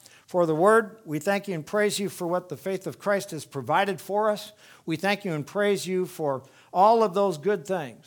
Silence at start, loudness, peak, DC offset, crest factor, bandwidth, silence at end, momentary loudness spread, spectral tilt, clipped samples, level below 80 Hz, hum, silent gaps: 0.3 s; -26 LUFS; -6 dBFS; under 0.1%; 20 dB; 19.5 kHz; 0.1 s; 13 LU; -5 dB/octave; under 0.1%; -76 dBFS; none; none